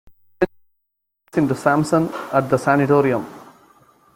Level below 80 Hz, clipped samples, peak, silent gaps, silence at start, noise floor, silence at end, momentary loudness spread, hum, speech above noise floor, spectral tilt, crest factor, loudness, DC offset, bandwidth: -54 dBFS; under 0.1%; -2 dBFS; none; 0.4 s; -75 dBFS; 0.75 s; 9 LU; none; 58 dB; -7 dB/octave; 18 dB; -19 LUFS; under 0.1%; 16.5 kHz